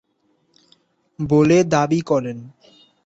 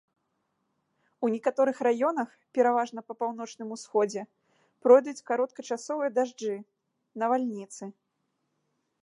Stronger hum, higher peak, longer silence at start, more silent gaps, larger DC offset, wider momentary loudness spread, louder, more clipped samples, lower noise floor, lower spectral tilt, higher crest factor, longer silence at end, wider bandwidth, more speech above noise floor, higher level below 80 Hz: neither; about the same, -4 dBFS vs -6 dBFS; about the same, 1.2 s vs 1.2 s; neither; neither; about the same, 16 LU vs 17 LU; first, -18 LUFS vs -28 LUFS; neither; second, -65 dBFS vs -78 dBFS; first, -6.5 dB/octave vs -5 dB/octave; about the same, 18 dB vs 22 dB; second, 0.55 s vs 1.1 s; second, 8 kHz vs 11 kHz; second, 47 dB vs 51 dB; first, -54 dBFS vs -88 dBFS